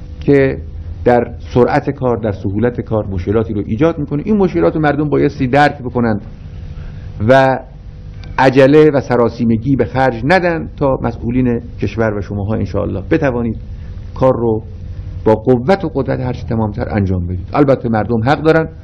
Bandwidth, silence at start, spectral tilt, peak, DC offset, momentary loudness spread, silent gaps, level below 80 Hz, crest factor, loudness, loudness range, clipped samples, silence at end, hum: 9.6 kHz; 0 s; -8.5 dB/octave; 0 dBFS; under 0.1%; 15 LU; none; -32 dBFS; 14 dB; -14 LUFS; 5 LU; 0.3%; 0 s; none